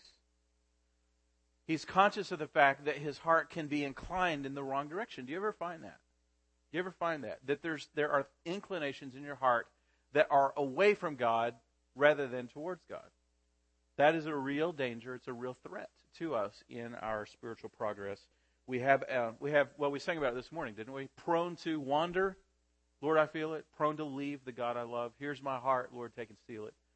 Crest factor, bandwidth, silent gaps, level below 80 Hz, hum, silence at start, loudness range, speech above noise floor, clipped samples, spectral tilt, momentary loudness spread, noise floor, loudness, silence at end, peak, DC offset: 24 dB; 8.4 kHz; none; -68 dBFS; none; 1.7 s; 7 LU; 41 dB; under 0.1%; -5.5 dB/octave; 16 LU; -76 dBFS; -35 LUFS; 0.25 s; -12 dBFS; under 0.1%